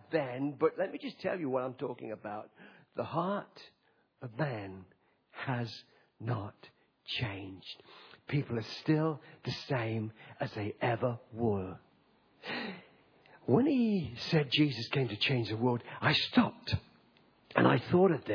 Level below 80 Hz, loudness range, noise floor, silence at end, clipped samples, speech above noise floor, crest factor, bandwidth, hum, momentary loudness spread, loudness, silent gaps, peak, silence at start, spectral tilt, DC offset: -66 dBFS; 10 LU; -68 dBFS; 0 s; under 0.1%; 35 dB; 22 dB; 5.4 kHz; none; 20 LU; -33 LUFS; none; -12 dBFS; 0.1 s; -7.5 dB/octave; under 0.1%